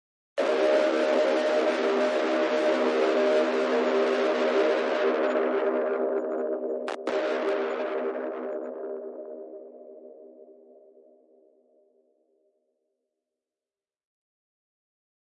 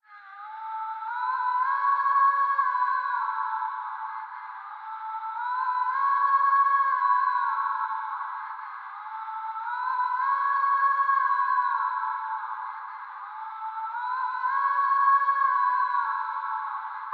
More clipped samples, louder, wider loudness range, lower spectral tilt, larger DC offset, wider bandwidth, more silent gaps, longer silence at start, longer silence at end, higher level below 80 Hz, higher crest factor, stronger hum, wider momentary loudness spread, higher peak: neither; about the same, -26 LUFS vs -26 LUFS; first, 15 LU vs 5 LU; first, -3.5 dB/octave vs 4.5 dB/octave; neither; first, 10.5 kHz vs 4.8 kHz; neither; first, 0.35 s vs 0.1 s; first, 4.85 s vs 0 s; about the same, under -90 dBFS vs under -90 dBFS; about the same, 14 dB vs 16 dB; neither; second, 13 LU vs 16 LU; about the same, -14 dBFS vs -12 dBFS